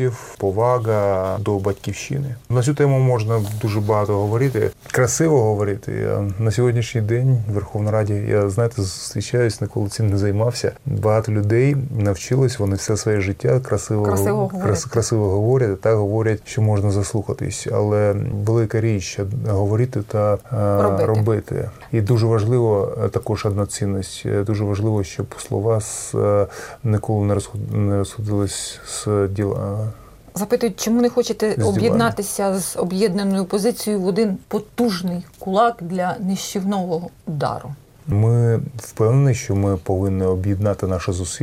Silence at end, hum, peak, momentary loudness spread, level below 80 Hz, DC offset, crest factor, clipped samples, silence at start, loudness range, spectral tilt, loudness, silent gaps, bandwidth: 0 s; none; -4 dBFS; 7 LU; -46 dBFS; under 0.1%; 16 dB; under 0.1%; 0 s; 3 LU; -6.5 dB/octave; -20 LUFS; none; 16 kHz